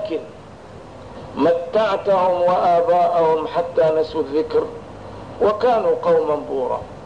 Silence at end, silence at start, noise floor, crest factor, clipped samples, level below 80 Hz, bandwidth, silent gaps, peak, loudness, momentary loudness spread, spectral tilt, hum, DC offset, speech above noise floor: 0 s; 0 s; -39 dBFS; 12 dB; under 0.1%; -50 dBFS; 9.6 kHz; none; -8 dBFS; -18 LUFS; 20 LU; -6.5 dB/octave; none; 0.3%; 21 dB